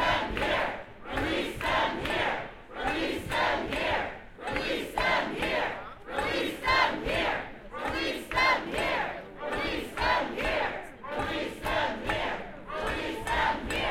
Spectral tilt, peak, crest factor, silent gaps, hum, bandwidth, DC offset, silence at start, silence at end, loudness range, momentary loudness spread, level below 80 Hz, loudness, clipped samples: -4 dB/octave; -12 dBFS; 18 dB; none; none; 16.5 kHz; under 0.1%; 0 s; 0 s; 2 LU; 10 LU; -46 dBFS; -30 LUFS; under 0.1%